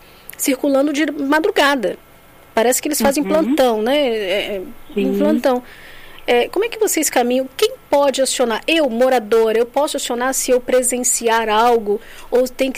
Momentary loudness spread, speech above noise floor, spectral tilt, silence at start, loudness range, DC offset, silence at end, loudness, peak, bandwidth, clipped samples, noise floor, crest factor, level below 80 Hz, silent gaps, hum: 7 LU; 28 dB; -2.5 dB/octave; 0.4 s; 2 LU; under 0.1%; 0 s; -17 LUFS; -4 dBFS; 15.5 kHz; under 0.1%; -45 dBFS; 14 dB; -46 dBFS; none; none